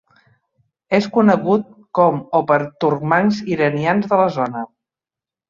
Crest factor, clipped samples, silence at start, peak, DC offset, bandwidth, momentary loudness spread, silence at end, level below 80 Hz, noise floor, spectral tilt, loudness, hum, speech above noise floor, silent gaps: 16 dB; under 0.1%; 0.9 s; -2 dBFS; under 0.1%; 7.2 kHz; 8 LU; 0.85 s; -60 dBFS; -89 dBFS; -7.5 dB/octave; -17 LUFS; none; 73 dB; none